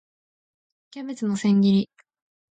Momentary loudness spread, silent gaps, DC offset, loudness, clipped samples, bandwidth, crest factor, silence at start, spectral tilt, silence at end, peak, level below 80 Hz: 18 LU; none; under 0.1%; -22 LUFS; under 0.1%; 8.8 kHz; 14 dB; 0.95 s; -7 dB/octave; 0.65 s; -10 dBFS; -68 dBFS